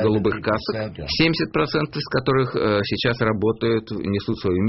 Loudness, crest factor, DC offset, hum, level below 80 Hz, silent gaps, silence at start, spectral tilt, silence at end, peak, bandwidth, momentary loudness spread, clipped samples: -22 LUFS; 16 dB; under 0.1%; none; -44 dBFS; none; 0 s; -4.5 dB/octave; 0 s; -6 dBFS; 6 kHz; 5 LU; under 0.1%